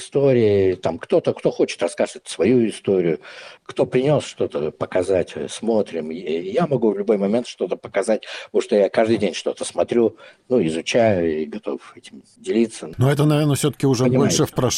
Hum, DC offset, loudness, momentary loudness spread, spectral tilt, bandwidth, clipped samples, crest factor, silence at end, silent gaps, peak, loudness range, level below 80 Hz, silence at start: none; under 0.1%; -20 LUFS; 9 LU; -5.5 dB/octave; 15.5 kHz; under 0.1%; 16 dB; 0 s; none; -4 dBFS; 2 LU; -56 dBFS; 0 s